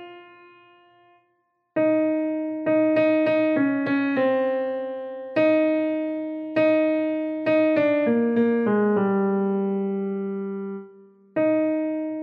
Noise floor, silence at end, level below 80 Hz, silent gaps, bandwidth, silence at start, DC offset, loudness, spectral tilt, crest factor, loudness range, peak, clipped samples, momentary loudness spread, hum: -70 dBFS; 0 s; -76 dBFS; none; 5.2 kHz; 0 s; under 0.1%; -23 LUFS; -9.5 dB/octave; 14 dB; 3 LU; -10 dBFS; under 0.1%; 10 LU; none